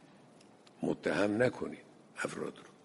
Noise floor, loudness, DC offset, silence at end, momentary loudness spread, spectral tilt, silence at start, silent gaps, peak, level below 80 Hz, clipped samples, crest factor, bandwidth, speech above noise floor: -60 dBFS; -35 LUFS; under 0.1%; 0.15 s; 14 LU; -5.5 dB/octave; 0.8 s; none; -14 dBFS; -70 dBFS; under 0.1%; 22 dB; 11.5 kHz; 25 dB